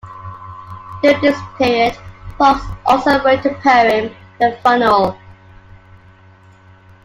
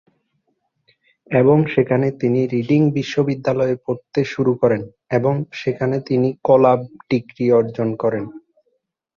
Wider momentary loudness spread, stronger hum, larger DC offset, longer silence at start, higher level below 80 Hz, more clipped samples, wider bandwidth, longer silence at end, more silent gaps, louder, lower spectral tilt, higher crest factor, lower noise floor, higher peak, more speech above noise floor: first, 21 LU vs 9 LU; neither; neither; second, 0.05 s vs 1.3 s; first, -42 dBFS vs -58 dBFS; neither; first, 15.5 kHz vs 7.2 kHz; first, 1.9 s vs 0.8 s; neither; first, -14 LUFS vs -18 LUFS; second, -5.5 dB/octave vs -8.5 dB/octave; about the same, 16 dB vs 16 dB; second, -45 dBFS vs -70 dBFS; about the same, 0 dBFS vs -2 dBFS; second, 31 dB vs 52 dB